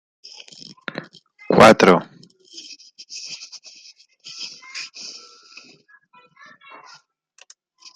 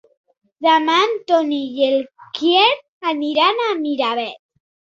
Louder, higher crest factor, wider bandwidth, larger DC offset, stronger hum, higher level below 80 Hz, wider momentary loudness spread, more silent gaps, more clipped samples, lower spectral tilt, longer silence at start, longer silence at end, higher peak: about the same, -15 LUFS vs -17 LUFS; about the same, 22 dB vs 18 dB; first, 11.5 kHz vs 7.8 kHz; neither; neither; first, -58 dBFS vs -70 dBFS; first, 30 LU vs 9 LU; second, none vs 2.88-3.01 s; neither; first, -4.5 dB/octave vs -2.5 dB/octave; first, 1.5 s vs 0.6 s; first, 2.85 s vs 0.6 s; about the same, 0 dBFS vs -2 dBFS